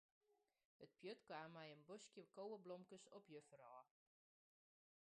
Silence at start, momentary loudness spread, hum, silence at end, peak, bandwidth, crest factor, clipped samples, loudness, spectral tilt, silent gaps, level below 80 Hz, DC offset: 0.3 s; 9 LU; none; 1.3 s; -42 dBFS; 9.6 kHz; 20 dB; under 0.1%; -60 LUFS; -4.5 dB/octave; 0.65-0.79 s; under -90 dBFS; under 0.1%